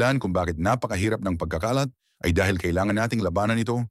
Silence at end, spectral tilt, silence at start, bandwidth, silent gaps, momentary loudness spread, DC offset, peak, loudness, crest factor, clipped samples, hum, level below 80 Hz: 0 s; -6 dB/octave; 0 s; 15.5 kHz; none; 4 LU; under 0.1%; -8 dBFS; -25 LUFS; 16 dB; under 0.1%; none; -42 dBFS